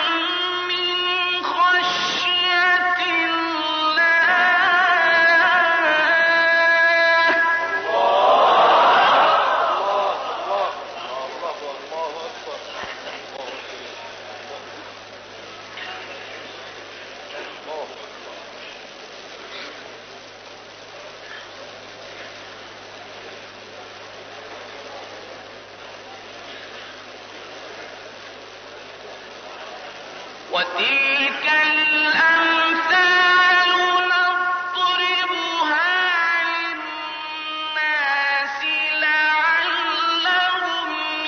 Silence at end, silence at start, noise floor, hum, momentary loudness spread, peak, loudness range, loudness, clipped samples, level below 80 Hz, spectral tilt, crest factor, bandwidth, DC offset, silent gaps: 0 s; 0 s; -40 dBFS; none; 23 LU; -6 dBFS; 21 LU; -17 LUFS; under 0.1%; -70 dBFS; 2.5 dB/octave; 14 dB; 6.4 kHz; under 0.1%; none